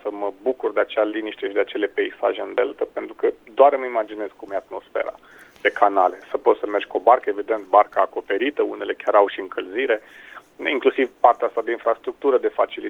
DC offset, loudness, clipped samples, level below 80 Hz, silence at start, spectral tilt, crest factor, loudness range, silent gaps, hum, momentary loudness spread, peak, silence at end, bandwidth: under 0.1%; -21 LUFS; under 0.1%; -66 dBFS; 0.05 s; -4.5 dB/octave; 20 dB; 3 LU; none; none; 11 LU; 0 dBFS; 0 s; 6.8 kHz